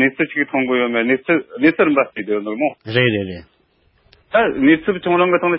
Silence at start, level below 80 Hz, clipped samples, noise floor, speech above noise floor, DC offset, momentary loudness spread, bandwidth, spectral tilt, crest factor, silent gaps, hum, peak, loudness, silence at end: 0 s; -52 dBFS; under 0.1%; -59 dBFS; 42 dB; under 0.1%; 8 LU; 5.6 kHz; -11 dB/octave; 16 dB; none; none; -2 dBFS; -17 LUFS; 0 s